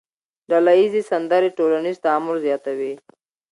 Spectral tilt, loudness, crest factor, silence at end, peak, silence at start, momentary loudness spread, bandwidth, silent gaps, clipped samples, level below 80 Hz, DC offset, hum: -6 dB/octave; -19 LUFS; 16 dB; 0.55 s; -4 dBFS; 0.5 s; 11 LU; 11 kHz; none; under 0.1%; -74 dBFS; under 0.1%; none